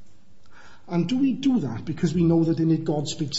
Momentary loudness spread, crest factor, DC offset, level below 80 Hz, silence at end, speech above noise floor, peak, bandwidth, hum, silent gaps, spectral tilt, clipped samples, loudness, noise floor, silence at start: 7 LU; 14 dB; 1%; -54 dBFS; 0 s; 30 dB; -10 dBFS; 8 kHz; none; none; -6.5 dB/octave; under 0.1%; -23 LUFS; -53 dBFS; 0 s